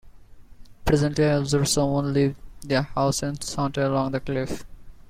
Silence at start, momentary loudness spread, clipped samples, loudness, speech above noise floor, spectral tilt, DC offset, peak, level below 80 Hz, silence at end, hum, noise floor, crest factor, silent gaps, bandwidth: 0.05 s; 8 LU; under 0.1%; -24 LUFS; 22 dB; -5.5 dB/octave; under 0.1%; -6 dBFS; -42 dBFS; 0.1 s; none; -45 dBFS; 18 dB; none; 16 kHz